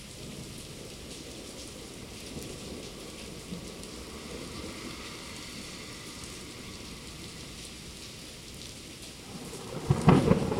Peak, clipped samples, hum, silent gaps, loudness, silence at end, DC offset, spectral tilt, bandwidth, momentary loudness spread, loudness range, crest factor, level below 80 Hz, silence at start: -6 dBFS; under 0.1%; none; none; -35 LUFS; 0 s; under 0.1%; -5.5 dB/octave; 16.5 kHz; 11 LU; 9 LU; 28 dB; -50 dBFS; 0 s